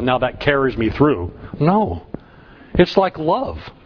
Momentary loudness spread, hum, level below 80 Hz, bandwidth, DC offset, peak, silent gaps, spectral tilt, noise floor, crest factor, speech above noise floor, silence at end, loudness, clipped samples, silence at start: 14 LU; none; -38 dBFS; 5.4 kHz; under 0.1%; 0 dBFS; none; -8 dB/octave; -44 dBFS; 18 dB; 26 dB; 0.15 s; -18 LUFS; under 0.1%; 0 s